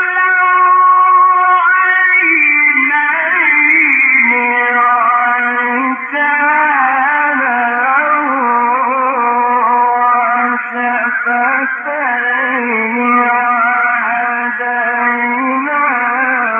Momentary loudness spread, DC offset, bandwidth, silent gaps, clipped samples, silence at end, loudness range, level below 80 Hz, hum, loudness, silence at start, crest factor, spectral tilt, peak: 7 LU; under 0.1%; 3.6 kHz; none; under 0.1%; 0 s; 5 LU; -78 dBFS; none; -11 LUFS; 0 s; 12 dB; -6 dB/octave; 0 dBFS